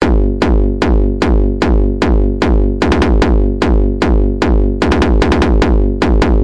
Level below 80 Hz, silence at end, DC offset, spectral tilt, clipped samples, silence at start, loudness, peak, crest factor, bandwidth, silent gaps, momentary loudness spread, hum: -12 dBFS; 0 s; 0.9%; -7.5 dB/octave; under 0.1%; 0 s; -13 LUFS; 0 dBFS; 10 dB; 8.4 kHz; none; 2 LU; none